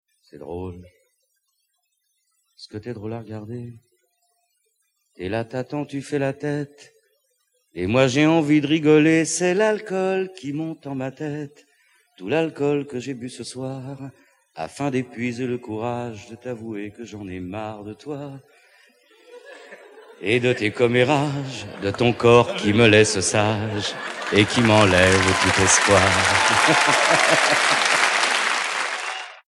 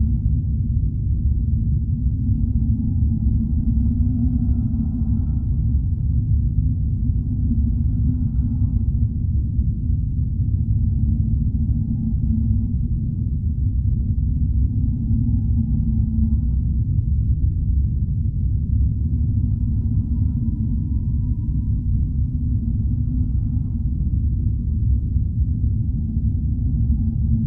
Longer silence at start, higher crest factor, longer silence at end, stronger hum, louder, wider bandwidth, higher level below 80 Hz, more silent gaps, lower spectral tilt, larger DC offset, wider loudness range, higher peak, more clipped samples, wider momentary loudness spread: first, 0.35 s vs 0 s; first, 20 dB vs 12 dB; first, 0.15 s vs 0 s; neither; first, -19 LUFS vs -22 LUFS; first, 12.5 kHz vs 1 kHz; second, -54 dBFS vs -22 dBFS; neither; second, -4 dB/octave vs -15 dB/octave; neither; first, 20 LU vs 1 LU; first, -2 dBFS vs -8 dBFS; neither; first, 19 LU vs 2 LU